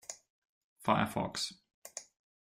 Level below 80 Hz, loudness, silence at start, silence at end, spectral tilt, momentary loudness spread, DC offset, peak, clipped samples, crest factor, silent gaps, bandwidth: -68 dBFS; -34 LUFS; 0.1 s; 0.4 s; -4 dB/octave; 19 LU; under 0.1%; -14 dBFS; under 0.1%; 24 dB; 0.30-0.42 s, 0.49-0.76 s, 1.74-1.82 s; 16 kHz